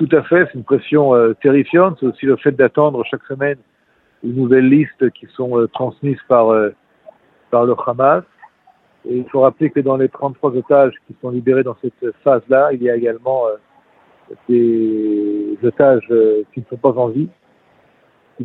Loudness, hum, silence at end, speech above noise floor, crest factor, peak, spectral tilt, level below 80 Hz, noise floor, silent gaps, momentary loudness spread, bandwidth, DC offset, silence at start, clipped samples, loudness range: -15 LUFS; none; 0 s; 44 dB; 16 dB; 0 dBFS; -10.5 dB/octave; -62 dBFS; -58 dBFS; none; 11 LU; 4.1 kHz; under 0.1%; 0 s; under 0.1%; 3 LU